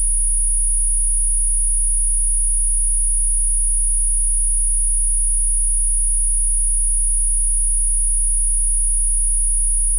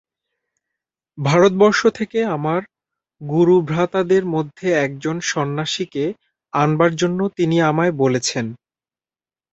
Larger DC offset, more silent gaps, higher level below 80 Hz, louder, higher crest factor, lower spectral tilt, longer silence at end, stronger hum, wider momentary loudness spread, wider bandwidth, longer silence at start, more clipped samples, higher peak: first, 0.4% vs under 0.1%; neither; first, -20 dBFS vs -58 dBFS; about the same, -16 LUFS vs -18 LUFS; second, 6 dB vs 18 dB; second, -1 dB/octave vs -5.5 dB/octave; second, 0 s vs 1 s; neither; second, 0 LU vs 10 LU; first, 11 kHz vs 8.2 kHz; second, 0 s vs 1.15 s; neither; second, -10 dBFS vs -2 dBFS